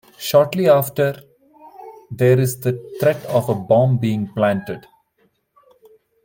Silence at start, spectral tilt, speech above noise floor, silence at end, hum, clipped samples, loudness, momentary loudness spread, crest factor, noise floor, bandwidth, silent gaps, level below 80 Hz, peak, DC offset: 0.2 s; -6.5 dB/octave; 46 dB; 1.45 s; none; under 0.1%; -18 LUFS; 16 LU; 18 dB; -64 dBFS; 17 kHz; none; -60 dBFS; -2 dBFS; under 0.1%